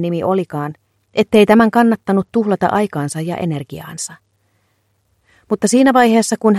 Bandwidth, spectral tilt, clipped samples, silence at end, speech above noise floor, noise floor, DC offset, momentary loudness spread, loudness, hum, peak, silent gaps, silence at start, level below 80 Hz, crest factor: 14 kHz; -5.5 dB/octave; under 0.1%; 0 s; 48 dB; -63 dBFS; under 0.1%; 15 LU; -15 LUFS; none; 0 dBFS; none; 0 s; -54 dBFS; 16 dB